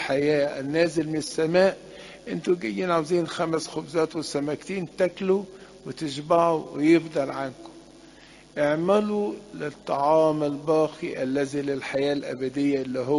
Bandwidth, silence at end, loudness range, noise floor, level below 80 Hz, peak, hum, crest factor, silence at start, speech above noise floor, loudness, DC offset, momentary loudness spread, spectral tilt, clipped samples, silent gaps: 11.5 kHz; 0 s; 2 LU; -50 dBFS; -62 dBFS; -6 dBFS; none; 18 dB; 0 s; 25 dB; -25 LUFS; under 0.1%; 13 LU; -5.5 dB/octave; under 0.1%; none